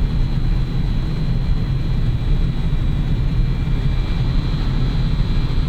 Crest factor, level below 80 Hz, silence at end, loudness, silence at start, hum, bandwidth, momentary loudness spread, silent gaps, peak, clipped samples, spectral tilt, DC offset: 12 dB; -18 dBFS; 0 s; -21 LUFS; 0 s; none; 5.2 kHz; 1 LU; none; -6 dBFS; under 0.1%; -8 dB/octave; under 0.1%